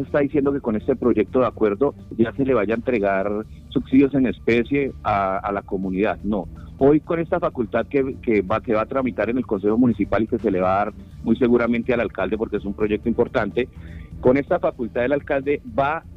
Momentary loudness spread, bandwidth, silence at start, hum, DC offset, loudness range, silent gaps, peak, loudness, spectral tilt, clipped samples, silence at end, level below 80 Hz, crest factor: 7 LU; 6.4 kHz; 0 s; none; under 0.1%; 2 LU; none; -4 dBFS; -21 LUFS; -9 dB/octave; under 0.1%; 0 s; -42 dBFS; 18 dB